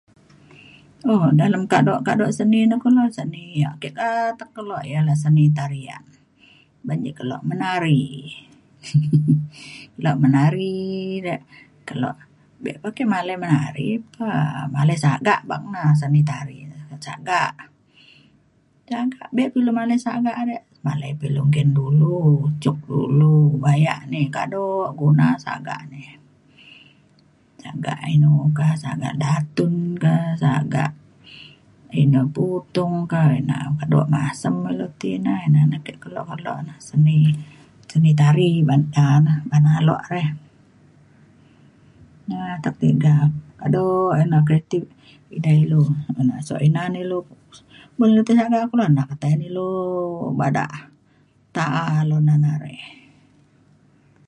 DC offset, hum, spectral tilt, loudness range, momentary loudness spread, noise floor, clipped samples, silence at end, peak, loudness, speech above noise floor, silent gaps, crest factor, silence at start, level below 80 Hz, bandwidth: under 0.1%; none; -8 dB/octave; 6 LU; 14 LU; -59 dBFS; under 0.1%; 1.35 s; -2 dBFS; -20 LUFS; 40 dB; none; 18 dB; 1.05 s; -58 dBFS; 11 kHz